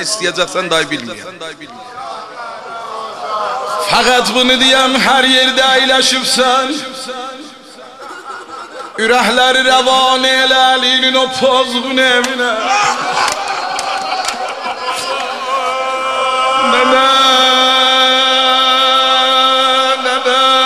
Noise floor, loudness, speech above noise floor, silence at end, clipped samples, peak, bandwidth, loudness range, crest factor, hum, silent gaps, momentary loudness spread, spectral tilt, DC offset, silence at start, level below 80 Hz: -35 dBFS; -11 LUFS; 23 dB; 0 s; under 0.1%; 0 dBFS; 15 kHz; 8 LU; 12 dB; none; none; 18 LU; -1 dB/octave; 0.2%; 0 s; -50 dBFS